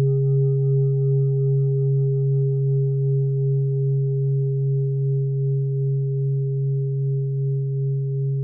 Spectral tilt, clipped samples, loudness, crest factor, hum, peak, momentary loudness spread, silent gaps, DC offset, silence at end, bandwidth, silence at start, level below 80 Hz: -16.5 dB/octave; under 0.1%; -22 LUFS; 8 dB; none; -12 dBFS; 4 LU; none; under 0.1%; 0 s; 0.8 kHz; 0 s; -70 dBFS